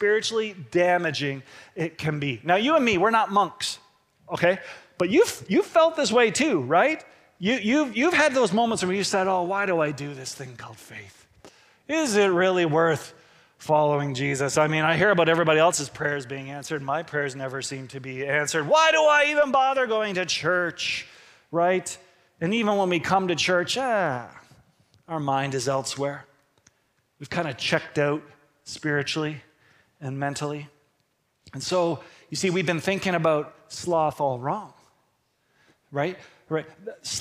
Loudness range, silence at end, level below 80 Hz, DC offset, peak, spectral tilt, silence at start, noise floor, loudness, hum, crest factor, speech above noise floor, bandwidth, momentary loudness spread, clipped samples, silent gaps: 8 LU; 0 s; -64 dBFS; under 0.1%; -6 dBFS; -4 dB/octave; 0 s; -71 dBFS; -24 LUFS; none; 20 dB; 47 dB; 16 kHz; 15 LU; under 0.1%; none